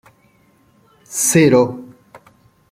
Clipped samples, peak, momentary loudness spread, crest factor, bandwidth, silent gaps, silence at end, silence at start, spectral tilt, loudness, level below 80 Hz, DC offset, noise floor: under 0.1%; -2 dBFS; 16 LU; 18 dB; 16.5 kHz; none; 0.55 s; 1.1 s; -4.5 dB/octave; -14 LUFS; -56 dBFS; under 0.1%; -55 dBFS